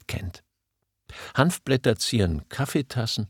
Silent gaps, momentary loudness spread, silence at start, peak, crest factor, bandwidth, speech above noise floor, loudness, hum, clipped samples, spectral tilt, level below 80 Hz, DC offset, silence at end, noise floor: none; 15 LU; 0.1 s; -4 dBFS; 22 dB; 18 kHz; 55 dB; -25 LUFS; none; under 0.1%; -5 dB/octave; -44 dBFS; under 0.1%; 0 s; -79 dBFS